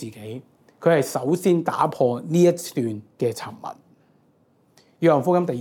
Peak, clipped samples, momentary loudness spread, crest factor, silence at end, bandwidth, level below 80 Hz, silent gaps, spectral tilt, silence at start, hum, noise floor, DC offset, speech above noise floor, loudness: -4 dBFS; under 0.1%; 18 LU; 20 dB; 0 s; 18 kHz; -74 dBFS; none; -6.5 dB/octave; 0 s; none; -61 dBFS; under 0.1%; 40 dB; -22 LUFS